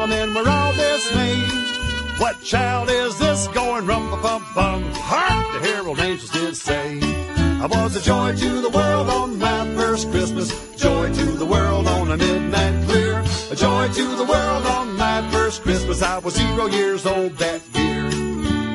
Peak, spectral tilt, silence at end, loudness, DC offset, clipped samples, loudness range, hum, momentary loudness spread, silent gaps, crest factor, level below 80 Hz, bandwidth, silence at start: -4 dBFS; -4.5 dB/octave; 0 s; -20 LUFS; under 0.1%; under 0.1%; 2 LU; none; 4 LU; none; 16 dB; -30 dBFS; 11.5 kHz; 0 s